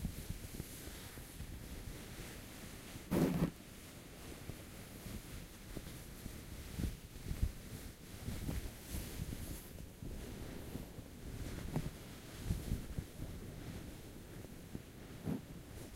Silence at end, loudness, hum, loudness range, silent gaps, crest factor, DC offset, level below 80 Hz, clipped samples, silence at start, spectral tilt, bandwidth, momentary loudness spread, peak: 0 s; -46 LUFS; none; 6 LU; none; 24 dB; under 0.1%; -50 dBFS; under 0.1%; 0 s; -5.5 dB/octave; 16 kHz; 10 LU; -22 dBFS